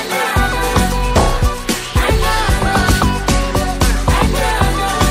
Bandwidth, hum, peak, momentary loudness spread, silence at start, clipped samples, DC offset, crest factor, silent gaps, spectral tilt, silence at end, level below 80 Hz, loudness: 16.5 kHz; none; -2 dBFS; 3 LU; 0 s; under 0.1%; under 0.1%; 12 dB; none; -4.5 dB/octave; 0 s; -18 dBFS; -15 LUFS